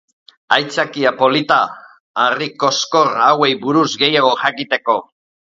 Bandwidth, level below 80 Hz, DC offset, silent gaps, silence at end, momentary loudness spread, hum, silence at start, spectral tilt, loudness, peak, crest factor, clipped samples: 7.8 kHz; -62 dBFS; under 0.1%; 2.00-2.14 s; 0.4 s; 7 LU; none; 0.5 s; -3.5 dB/octave; -15 LUFS; 0 dBFS; 16 dB; under 0.1%